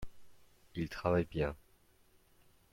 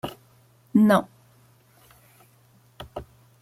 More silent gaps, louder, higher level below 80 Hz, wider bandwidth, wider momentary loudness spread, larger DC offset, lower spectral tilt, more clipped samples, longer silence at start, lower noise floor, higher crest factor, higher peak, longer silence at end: neither; second, -37 LUFS vs -21 LUFS; about the same, -56 dBFS vs -58 dBFS; about the same, 16.5 kHz vs 15 kHz; second, 20 LU vs 26 LU; neither; about the same, -7.5 dB/octave vs -7 dB/octave; neither; about the same, 0 s vs 0.05 s; first, -67 dBFS vs -58 dBFS; about the same, 22 dB vs 20 dB; second, -18 dBFS vs -8 dBFS; first, 1.15 s vs 0.4 s